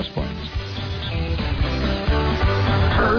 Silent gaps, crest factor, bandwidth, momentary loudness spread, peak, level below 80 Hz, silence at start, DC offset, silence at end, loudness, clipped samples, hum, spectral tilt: none; 12 dB; 5.4 kHz; 9 LU; -8 dBFS; -26 dBFS; 0 s; under 0.1%; 0 s; -22 LUFS; under 0.1%; none; -7 dB/octave